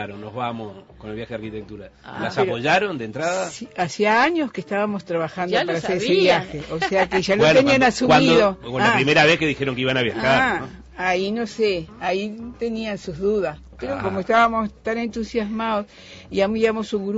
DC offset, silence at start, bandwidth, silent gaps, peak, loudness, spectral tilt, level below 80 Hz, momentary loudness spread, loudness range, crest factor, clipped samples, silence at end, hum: under 0.1%; 0 s; 8 kHz; none; -4 dBFS; -20 LUFS; -5 dB/octave; -48 dBFS; 16 LU; 8 LU; 16 dB; under 0.1%; 0 s; none